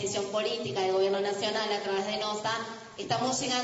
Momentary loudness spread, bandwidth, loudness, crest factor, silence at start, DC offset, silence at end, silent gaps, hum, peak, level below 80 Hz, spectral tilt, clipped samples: 5 LU; 8 kHz; -30 LUFS; 16 dB; 0 s; under 0.1%; 0 s; none; none; -14 dBFS; -70 dBFS; -3 dB/octave; under 0.1%